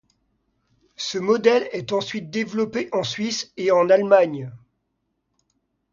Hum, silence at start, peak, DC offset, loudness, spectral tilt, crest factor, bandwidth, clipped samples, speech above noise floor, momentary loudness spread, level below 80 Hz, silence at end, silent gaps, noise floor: none; 1 s; -4 dBFS; under 0.1%; -21 LUFS; -4.5 dB/octave; 20 dB; 7.6 kHz; under 0.1%; 54 dB; 11 LU; -66 dBFS; 1.35 s; none; -75 dBFS